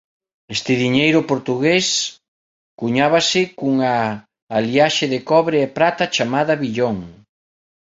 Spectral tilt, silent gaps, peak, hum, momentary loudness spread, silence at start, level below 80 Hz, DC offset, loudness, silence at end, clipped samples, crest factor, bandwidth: -4 dB/octave; 2.28-2.78 s, 4.42-4.47 s; 0 dBFS; none; 9 LU; 0.5 s; -56 dBFS; under 0.1%; -18 LUFS; 0.7 s; under 0.1%; 18 dB; 7.8 kHz